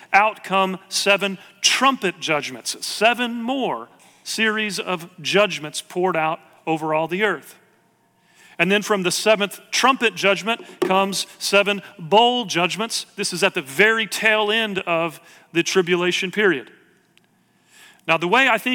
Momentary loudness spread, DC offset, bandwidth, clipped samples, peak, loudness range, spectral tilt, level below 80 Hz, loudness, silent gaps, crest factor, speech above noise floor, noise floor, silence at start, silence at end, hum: 10 LU; under 0.1%; 18 kHz; under 0.1%; -4 dBFS; 4 LU; -3 dB/octave; -70 dBFS; -20 LUFS; none; 18 dB; 40 dB; -61 dBFS; 0.1 s; 0 s; none